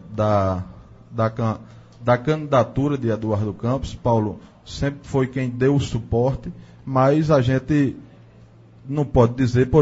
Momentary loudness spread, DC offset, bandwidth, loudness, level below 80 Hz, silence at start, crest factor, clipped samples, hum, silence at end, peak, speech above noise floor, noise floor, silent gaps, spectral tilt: 13 LU; under 0.1%; 8 kHz; -21 LUFS; -40 dBFS; 0 s; 20 dB; under 0.1%; none; 0 s; -2 dBFS; 28 dB; -47 dBFS; none; -8 dB/octave